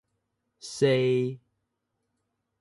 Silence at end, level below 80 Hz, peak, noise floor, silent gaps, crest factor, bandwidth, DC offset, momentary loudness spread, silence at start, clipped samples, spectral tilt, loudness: 1.25 s; -72 dBFS; -10 dBFS; -80 dBFS; none; 20 dB; 11.5 kHz; under 0.1%; 22 LU; 0.65 s; under 0.1%; -6 dB/octave; -26 LUFS